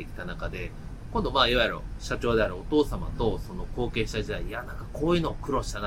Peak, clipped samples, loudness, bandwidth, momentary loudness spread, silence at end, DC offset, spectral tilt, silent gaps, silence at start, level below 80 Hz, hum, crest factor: -6 dBFS; under 0.1%; -28 LUFS; 16.5 kHz; 14 LU; 0 s; under 0.1%; -5.5 dB/octave; none; 0 s; -36 dBFS; none; 22 dB